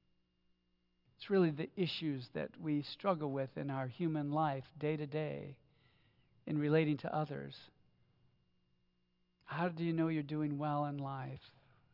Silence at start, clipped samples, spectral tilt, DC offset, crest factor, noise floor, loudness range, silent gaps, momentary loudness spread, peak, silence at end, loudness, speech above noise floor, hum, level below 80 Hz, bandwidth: 1.2 s; under 0.1%; -6 dB/octave; under 0.1%; 20 dB; -79 dBFS; 3 LU; none; 13 LU; -18 dBFS; 0.45 s; -38 LUFS; 41 dB; 60 Hz at -70 dBFS; -78 dBFS; 5.8 kHz